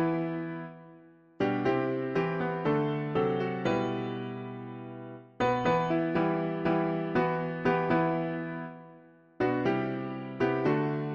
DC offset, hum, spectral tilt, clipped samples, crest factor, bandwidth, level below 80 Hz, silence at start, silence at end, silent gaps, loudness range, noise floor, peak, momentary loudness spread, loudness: under 0.1%; none; -8 dB/octave; under 0.1%; 16 dB; 7 kHz; -60 dBFS; 0 s; 0 s; none; 3 LU; -55 dBFS; -14 dBFS; 13 LU; -30 LUFS